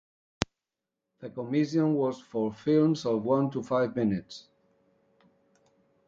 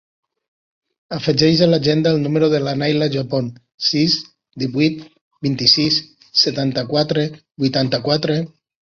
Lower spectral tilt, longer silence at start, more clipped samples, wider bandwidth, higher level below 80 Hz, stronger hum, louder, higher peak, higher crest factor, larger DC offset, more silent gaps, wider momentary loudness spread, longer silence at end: first, -7 dB/octave vs -5.5 dB/octave; second, 0.4 s vs 1.1 s; neither; about the same, 7.8 kHz vs 7.2 kHz; second, -62 dBFS vs -54 dBFS; neither; second, -28 LUFS vs -17 LUFS; about the same, -2 dBFS vs -2 dBFS; first, 28 dB vs 18 dB; neither; second, none vs 3.74-3.78 s, 5.21-5.31 s; first, 15 LU vs 11 LU; first, 1.65 s vs 0.55 s